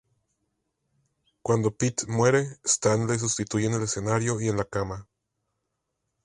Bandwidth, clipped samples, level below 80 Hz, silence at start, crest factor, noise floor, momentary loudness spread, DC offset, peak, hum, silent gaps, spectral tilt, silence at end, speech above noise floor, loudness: 11.5 kHz; under 0.1%; -54 dBFS; 1.45 s; 20 dB; -80 dBFS; 8 LU; under 0.1%; -8 dBFS; none; none; -4.5 dB/octave; 1.2 s; 55 dB; -26 LUFS